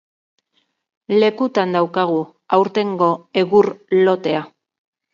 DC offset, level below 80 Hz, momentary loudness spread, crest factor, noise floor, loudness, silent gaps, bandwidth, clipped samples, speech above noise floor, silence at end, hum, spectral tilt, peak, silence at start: under 0.1%; -68 dBFS; 5 LU; 18 dB; -67 dBFS; -18 LUFS; none; 7.2 kHz; under 0.1%; 51 dB; 0.65 s; none; -7 dB/octave; 0 dBFS; 1.1 s